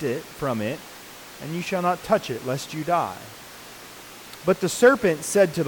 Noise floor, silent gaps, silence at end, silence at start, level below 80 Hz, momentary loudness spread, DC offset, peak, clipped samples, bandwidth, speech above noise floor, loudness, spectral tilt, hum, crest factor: -42 dBFS; none; 0 s; 0 s; -58 dBFS; 22 LU; under 0.1%; -6 dBFS; under 0.1%; 19 kHz; 19 dB; -23 LUFS; -4.5 dB/octave; none; 18 dB